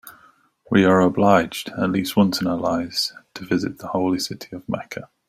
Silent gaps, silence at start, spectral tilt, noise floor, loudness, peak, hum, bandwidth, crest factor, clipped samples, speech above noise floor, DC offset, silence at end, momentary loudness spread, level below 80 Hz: none; 0.05 s; -5.5 dB/octave; -55 dBFS; -21 LUFS; -2 dBFS; none; 16 kHz; 20 dB; under 0.1%; 35 dB; under 0.1%; 0.25 s; 13 LU; -56 dBFS